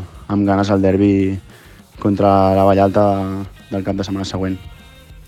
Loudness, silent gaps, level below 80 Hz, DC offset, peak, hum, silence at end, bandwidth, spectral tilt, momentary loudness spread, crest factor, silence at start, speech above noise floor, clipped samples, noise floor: -16 LUFS; none; -44 dBFS; under 0.1%; 0 dBFS; none; 0.05 s; 13.5 kHz; -8 dB/octave; 12 LU; 16 dB; 0 s; 27 dB; under 0.1%; -42 dBFS